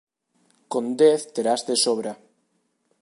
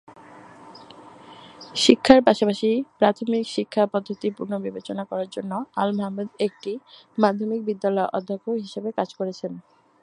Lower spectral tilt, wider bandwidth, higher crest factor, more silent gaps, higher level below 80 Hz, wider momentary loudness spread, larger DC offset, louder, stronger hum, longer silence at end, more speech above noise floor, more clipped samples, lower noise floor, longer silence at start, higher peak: second, -3 dB/octave vs -5 dB/octave; about the same, 11.5 kHz vs 11.5 kHz; second, 18 dB vs 24 dB; neither; second, -78 dBFS vs -60 dBFS; about the same, 13 LU vs 14 LU; neither; about the same, -22 LUFS vs -23 LUFS; neither; first, 0.85 s vs 0.45 s; first, 49 dB vs 23 dB; neither; first, -71 dBFS vs -46 dBFS; first, 0.7 s vs 0.3 s; second, -6 dBFS vs 0 dBFS